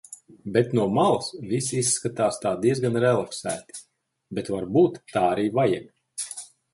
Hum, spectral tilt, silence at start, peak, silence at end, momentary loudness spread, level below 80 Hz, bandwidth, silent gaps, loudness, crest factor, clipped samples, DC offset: none; -5 dB/octave; 0.1 s; -6 dBFS; 0.3 s; 13 LU; -60 dBFS; 11.5 kHz; none; -24 LUFS; 18 dB; under 0.1%; under 0.1%